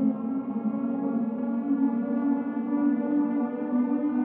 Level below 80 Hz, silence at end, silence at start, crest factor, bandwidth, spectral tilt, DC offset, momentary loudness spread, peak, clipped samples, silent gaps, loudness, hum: -84 dBFS; 0 s; 0 s; 12 dB; 3.1 kHz; -12 dB/octave; under 0.1%; 4 LU; -14 dBFS; under 0.1%; none; -27 LUFS; none